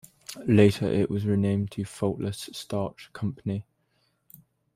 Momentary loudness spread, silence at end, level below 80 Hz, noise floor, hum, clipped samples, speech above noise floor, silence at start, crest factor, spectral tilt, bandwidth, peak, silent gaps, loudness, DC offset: 15 LU; 1.15 s; -60 dBFS; -71 dBFS; none; under 0.1%; 45 dB; 0.3 s; 22 dB; -7 dB/octave; 15.5 kHz; -6 dBFS; none; -27 LUFS; under 0.1%